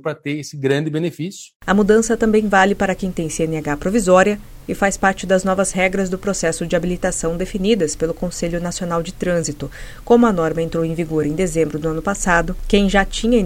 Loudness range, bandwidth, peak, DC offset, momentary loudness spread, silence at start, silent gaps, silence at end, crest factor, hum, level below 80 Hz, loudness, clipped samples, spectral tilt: 4 LU; 16.5 kHz; 0 dBFS; under 0.1%; 9 LU; 0.05 s; 1.56-1.60 s; 0 s; 18 dB; none; -34 dBFS; -18 LUFS; under 0.1%; -5 dB/octave